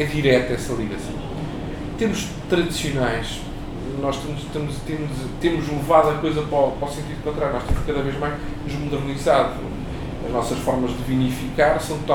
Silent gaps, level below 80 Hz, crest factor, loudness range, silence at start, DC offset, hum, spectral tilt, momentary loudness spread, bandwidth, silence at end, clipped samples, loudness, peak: none; -34 dBFS; 20 dB; 3 LU; 0 s; under 0.1%; none; -6 dB/octave; 12 LU; 18.5 kHz; 0 s; under 0.1%; -23 LUFS; -4 dBFS